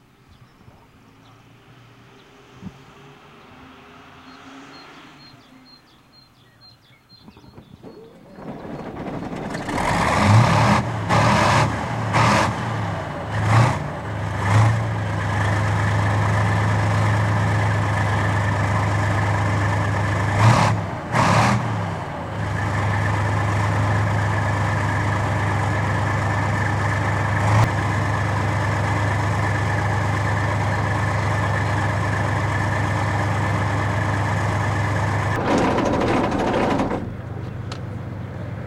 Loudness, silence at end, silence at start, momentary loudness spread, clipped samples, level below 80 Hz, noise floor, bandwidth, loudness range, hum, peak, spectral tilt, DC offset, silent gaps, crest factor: -21 LUFS; 0 s; 2.55 s; 13 LU; under 0.1%; -40 dBFS; -51 dBFS; 12 kHz; 3 LU; none; -4 dBFS; -6 dB/octave; under 0.1%; none; 18 dB